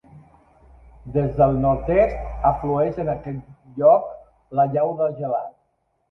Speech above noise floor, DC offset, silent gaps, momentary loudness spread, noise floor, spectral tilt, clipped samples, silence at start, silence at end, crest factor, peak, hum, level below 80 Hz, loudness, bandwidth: 49 dB; under 0.1%; none; 15 LU; -69 dBFS; -11 dB/octave; under 0.1%; 0.15 s; 0.6 s; 18 dB; -4 dBFS; none; -40 dBFS; -21 LUFS; 5.4 kHz